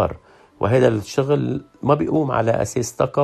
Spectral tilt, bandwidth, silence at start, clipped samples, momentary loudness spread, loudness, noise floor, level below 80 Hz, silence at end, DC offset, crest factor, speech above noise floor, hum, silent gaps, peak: -6.5 dB/octave; 14 kHz; 0 s; under 0.1%; 8 LU; -20 LUFS; -40 dBFS; -48 dBFS; 0 s; under 0.1%; 18 dB; 21 dB; none; none; -2 dBFS